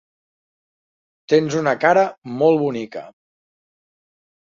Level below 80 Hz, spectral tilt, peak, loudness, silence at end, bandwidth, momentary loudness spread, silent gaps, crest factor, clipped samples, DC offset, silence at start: -66 dBFS; -6 dB/octave; -2 dBFS; -18 LUFS; 1.3 s; 7.4 kHz; 13 LU; 2.18-2.22 s; 20 dB; under 0.1%; under 0.1%; 1.3 s